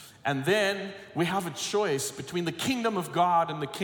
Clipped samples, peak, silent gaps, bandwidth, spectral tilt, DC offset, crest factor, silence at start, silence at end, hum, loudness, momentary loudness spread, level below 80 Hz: under 0.1%; -12 dBFS; none; 18 kHz; -4 dB/octave; under 0.1%; 16 dB; 0 s; 0 s; none; -28 LUFS; 7 LU; -70 dBFS